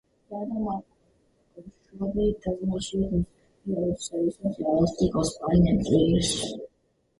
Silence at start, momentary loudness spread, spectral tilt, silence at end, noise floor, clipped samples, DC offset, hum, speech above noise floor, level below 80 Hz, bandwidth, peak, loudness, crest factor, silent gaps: 0.3 s; 14 LU; -6 dB/octave; 0.55 s; -70 dBFS; under 0.1%; under 0.1%; none; 44 dB; -42 dBFS; 11.5 kHz; -8 dBFS; -26 LUFS; 18 dB; none